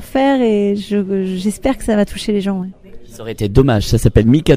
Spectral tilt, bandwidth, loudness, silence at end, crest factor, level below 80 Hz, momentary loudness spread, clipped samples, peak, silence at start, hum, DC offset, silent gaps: -7 dB/octave; 16 kHz; -15 LUFS; 0 s; 14 dB; -28 dBFS; 10 LU; under 0.1%; 0 dBFS; 0 s; none; under 0.1%; none